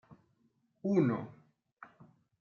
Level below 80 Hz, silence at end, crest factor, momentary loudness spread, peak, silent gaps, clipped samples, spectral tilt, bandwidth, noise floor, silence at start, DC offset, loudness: -80 dBFS; 0.55 s; 20 dB; 26 LU; -16 dBFS; 1.72-1.77 s; under 0.1%; -9.5 dB/octave; 7 kHz; -75 dBFS; 0.85 s; under 0.1%; -33 LUFS